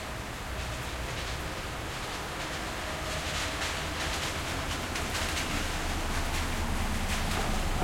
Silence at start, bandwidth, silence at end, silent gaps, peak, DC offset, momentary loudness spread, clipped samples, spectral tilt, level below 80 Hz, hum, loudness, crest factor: 0 s; 16.5 kHz; 0 s; none; -16 dBFS; under 0.1%; 5 LU; under 0.1%; -3.5 dB/octave; -38 dBFS; none; -33 LUFS; 16 dB